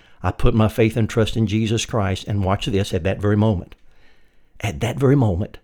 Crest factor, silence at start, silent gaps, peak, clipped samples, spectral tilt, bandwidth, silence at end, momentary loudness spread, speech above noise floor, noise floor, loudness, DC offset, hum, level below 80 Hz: 16 dB; 0.2 s; none; -2 dBFS; under 0.1%; -6.5 dB/octave; 16 kHz; 0.05 s; 7 LU; 30 dB; -49 dBFS; -20 LUFS; under 0.1%; none; -32 dBFS